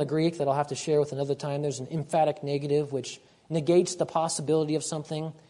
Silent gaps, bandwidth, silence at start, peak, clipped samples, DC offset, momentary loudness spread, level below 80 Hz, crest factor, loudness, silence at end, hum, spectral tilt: none; 11 kHz; 0 s; -10 dBFS; under 0.1%; under 0.1%; 9 LU; -70 dBFS; 16 dB; -28 LUFS; 0.1 s; none; -5.5 dB/octave